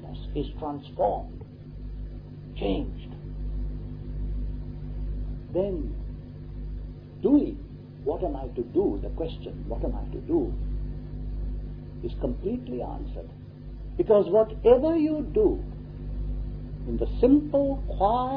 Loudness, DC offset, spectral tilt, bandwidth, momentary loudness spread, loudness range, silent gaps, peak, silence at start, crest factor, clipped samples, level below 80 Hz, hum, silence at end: -28 LUFS; under 0.1%; -11.5 dB/octave; 5 kHz; 19 LU; 10 LU; none; -6 dBFS; 0 s; 22 dB; under 0.1%; -36 dBFS; 50 Hz at -35 dBFS; 0 s